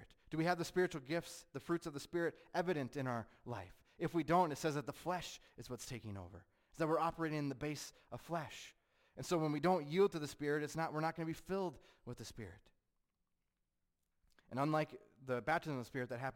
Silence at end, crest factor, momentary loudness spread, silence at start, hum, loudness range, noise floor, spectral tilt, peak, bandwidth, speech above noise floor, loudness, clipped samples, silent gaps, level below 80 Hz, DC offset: 0 s; 18 dB; 16 LU; 0 s; none; 7 LU; -86 dBFS; -5.5 dB/octave; -22 dBFS; 16.5 kHz; 46 dB; -40 LUFS; under 0.1%; none; -68 dBFS; under 0.1%